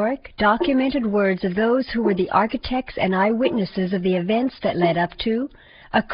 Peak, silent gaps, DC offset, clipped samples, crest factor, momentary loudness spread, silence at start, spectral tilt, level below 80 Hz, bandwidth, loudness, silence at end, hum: -4 dBFS; none; under 0.1%; under 0.1%; 16 dB; 5 LU; 0 s; -4.5 dB/octave; -46 dBFS; 5.4 kHz; -21 LUFS; 0 s; none